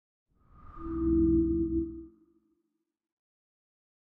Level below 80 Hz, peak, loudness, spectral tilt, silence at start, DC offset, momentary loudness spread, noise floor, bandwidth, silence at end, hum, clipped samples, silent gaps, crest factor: -42 dBFS; -16 dBFS; -29 LUFS; -14 dB/octave; 0.65 s; under 0.1%; 17 LU; -81 dBFS; 1.7 kHz; 1.95 s; none; under 0.1%; none; 16 dB